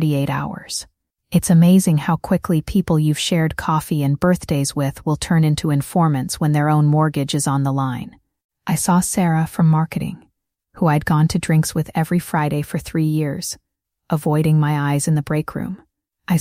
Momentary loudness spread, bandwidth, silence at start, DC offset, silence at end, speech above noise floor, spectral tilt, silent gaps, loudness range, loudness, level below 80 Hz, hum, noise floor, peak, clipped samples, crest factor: 11 LU; 16 kHz; 0 s; under 0.1%; 0 s; 48 dB; -6 dB/octave; 8.44-8.49 s; 3 LU; -18 LUFS; -44 dBFS; none; -65 dBFS; -4 dBFS; under 0.1%; 14 dB